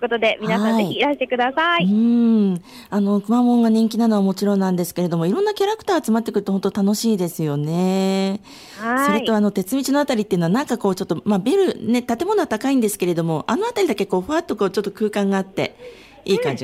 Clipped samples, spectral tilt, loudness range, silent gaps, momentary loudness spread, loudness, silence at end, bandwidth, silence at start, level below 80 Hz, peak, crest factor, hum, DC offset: under 0.1%; -6 dB/octave; 3 LU; none; 6 LU; -19 LUFS; 0 s; 16 kHz; 0 s; -58 dBFS; -8 dBFS; 12 dB; none; under 0.1%